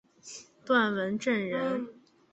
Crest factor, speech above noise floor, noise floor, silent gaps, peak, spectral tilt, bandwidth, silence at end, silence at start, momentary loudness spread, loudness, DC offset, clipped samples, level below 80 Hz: 18 dB; 21 dB; -50 dBFS; none; -12 dBFS; -5 dB/octave; 8.2 kHz; 0.4 s; 0.25 s; 19 LU; -29 LUFS; under 0.1%; under 0.1%; -74 dBFS